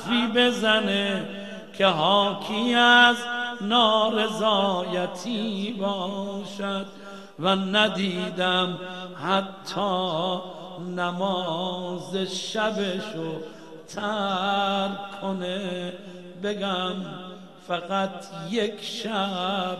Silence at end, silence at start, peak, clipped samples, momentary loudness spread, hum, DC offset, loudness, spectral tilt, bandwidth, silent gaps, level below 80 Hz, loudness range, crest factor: 0 s; 0 s; -4 dBFS; under 0.1%; 16 LU; none; 0.3%; -24 LUFS; -4.5 dB/octave; 13 kHz; none; -66 dBFS; 9 LU; 22 dB